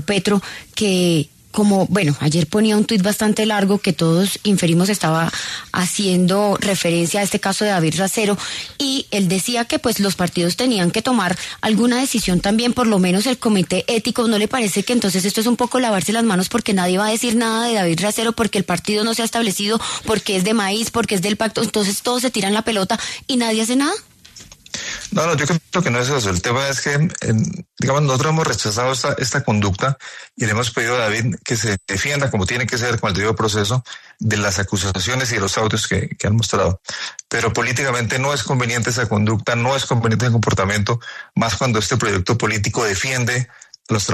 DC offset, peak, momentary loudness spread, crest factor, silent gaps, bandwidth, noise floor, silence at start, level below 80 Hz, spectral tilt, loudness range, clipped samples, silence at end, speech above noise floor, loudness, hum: under 0.1%; -4 dBFS; 5 LU; 14 dB; none; 14 kHz; -42 dBFS; 0 s; -48 dBFS; -4.5 dB/octave; 2 LU; under 0.1%; 0 s; 24 dB; -18 LUFS; none